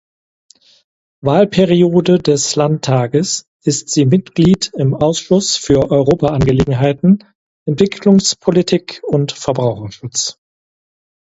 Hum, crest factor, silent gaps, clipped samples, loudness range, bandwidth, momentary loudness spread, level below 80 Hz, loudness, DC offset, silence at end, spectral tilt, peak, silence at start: none; 14 dB; 3.48-3.60 s, 7.35-7.66 s; under 0.1%; 2 LU; 8 kHz; 7 LU; -40 dBFS; -14 LUFS; under 0.1%; 1.05 s; -5.5 dB/octave; 0 dBFS; 1.25 s